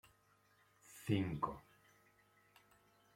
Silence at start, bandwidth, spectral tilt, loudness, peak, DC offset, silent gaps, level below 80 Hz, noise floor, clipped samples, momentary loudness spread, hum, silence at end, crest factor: 0.9 s; 16.5 kHz; -6.5 dB/octave; -41 LUFS; -22 dBFS; under 0.1%; none; -70 dBFS; -73 dBFS; under 0.1%; 19 LU; none; 1.55 s; 24 dB